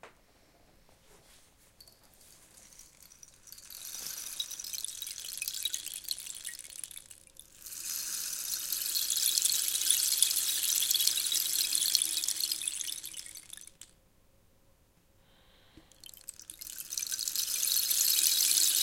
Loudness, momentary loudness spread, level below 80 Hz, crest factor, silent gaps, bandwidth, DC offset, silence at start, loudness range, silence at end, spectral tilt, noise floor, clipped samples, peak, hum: -29 LUFS; 21 LU; -68 dBFS; 30 dB; none; 17 kHz; under 0.1%; 0.05 s; 18 LU; 0 s; 3.5 dB/octave; -65 dBFS; under 0.1%; -4 dBFS; none